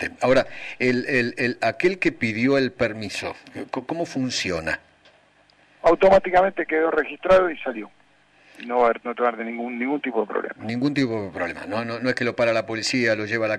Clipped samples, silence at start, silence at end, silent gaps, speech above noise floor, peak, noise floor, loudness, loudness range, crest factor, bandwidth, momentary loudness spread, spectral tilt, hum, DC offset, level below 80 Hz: under 0.1%; 0 s; 0 s; none; 35 dB; -8 dBFS; -58 dBFS; -23 LUFS; 5 LU; 14 dB; 11 kHz; 12 LU; -5 dB/octave; 50 Hz at -65 dBFS; under 0.1%; -52 dBFS